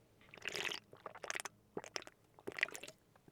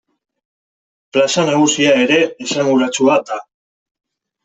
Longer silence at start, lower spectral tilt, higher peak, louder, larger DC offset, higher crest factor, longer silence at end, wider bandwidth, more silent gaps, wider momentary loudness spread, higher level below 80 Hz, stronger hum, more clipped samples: second, 0 s vs 1.15 s; second, -1 dB/octave vs -3.5 dB/octave; second, -18 dBFS vs -2 dBFS; second, -44 LUFS vs -14 LUFS; neither; first, 30 dB vs 14 dB; second, 0.15 s vs 1 s; first, over 20 kHz vs 8.4 kHz; neither; first, 15 LU vs 7 LU; second, -82 dBFS vs -62 dBFS; neither; neither